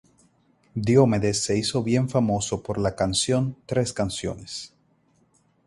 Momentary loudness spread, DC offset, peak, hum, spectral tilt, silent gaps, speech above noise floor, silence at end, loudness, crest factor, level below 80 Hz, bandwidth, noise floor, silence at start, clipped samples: 15 LU; under 0.1%; -4 dBFS; none; -5 dB/octave; none; 41 dB; 1 s; -24 LUFS; 20 dB; -48 dBFS; 11.5 kHz; -64 dBFS; 0.75 s; under 0.1%